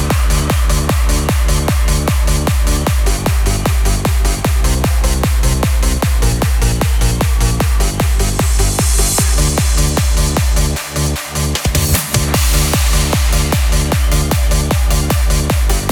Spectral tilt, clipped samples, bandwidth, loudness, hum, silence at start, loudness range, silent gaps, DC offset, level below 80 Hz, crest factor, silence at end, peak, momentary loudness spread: -4 dB/octave; under 0.1%; 19 kHz; -14 LUFS; none; 0 s; 1 LU; none; under 0.1%; -14 dBFS; 12 dB; 0 s; 0 dBFS; 2 LU